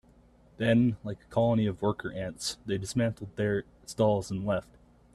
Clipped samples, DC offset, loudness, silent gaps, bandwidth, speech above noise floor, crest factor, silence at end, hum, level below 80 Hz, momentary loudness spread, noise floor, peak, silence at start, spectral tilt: under 0.1%; under 0.1%; -30 LUFS; none; 13 kHz; 30 dB; 18 dB; 0.5 s; none; -56 dBFS; 9 LU; -59 dBFS; -12 dBFS; 0.6 s; -6 dB/octave